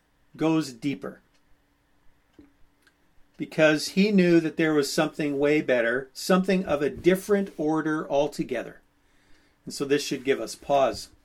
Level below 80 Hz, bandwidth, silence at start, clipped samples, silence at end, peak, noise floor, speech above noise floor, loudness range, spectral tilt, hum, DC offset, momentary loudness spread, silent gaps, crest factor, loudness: -58 dBFS; 16 kHz; 0.35 s; under 0.1%; 0.2 s; -8 dBFS; -65 dBFS; 41 dB; 7 LU; -5.5 dB/octave; none; under 0.1%; 12 LU; none; 18 dB; -25 LUFS